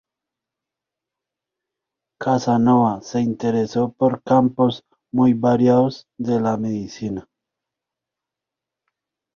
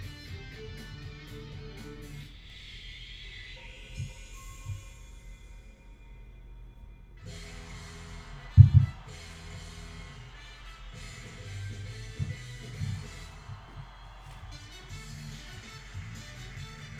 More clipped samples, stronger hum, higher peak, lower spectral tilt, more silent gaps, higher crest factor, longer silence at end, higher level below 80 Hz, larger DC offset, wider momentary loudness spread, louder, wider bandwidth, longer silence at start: neither; neither; about the same, -4 dBFS vs -2 dBFS; about the same, -7.5 dB/octave vs -6.5 dB/octave; neither; second, 18 dB vs 30 dB; first, 2.15 s vs 0 s; second, -58 dBFS vs -44 dBFS; neither; about the same, 12 LU vs 14 LU; first, -19 LUFS vs -31 LUFS; second, 7 kHz vs 11 kHz; first, 2.2 s vs 0 s